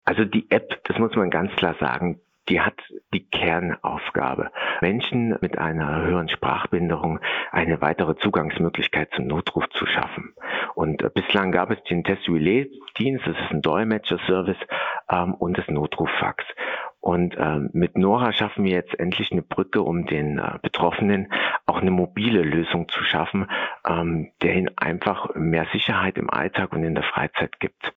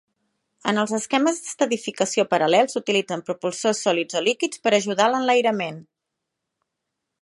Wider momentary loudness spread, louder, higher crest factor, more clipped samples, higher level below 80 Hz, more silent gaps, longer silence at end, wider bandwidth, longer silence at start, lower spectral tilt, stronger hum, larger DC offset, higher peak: second, 5 LU vs 9 LU; about the same, -23 LUFS vs -22 LUFS; about the same, 20 dB vs 20 dB; neither; first, -52 dBFS vs -76 dBFS; neither; second, 0.05 s vs 1.4 s; second, 5 kHz vs 11.5 kHz; second, 0.05 s vs 0.65 s; first, -8.5 dB/octave vs -3.5 dB/octave; neither; neither; about the same, -2 dBFS vs -4 dBFS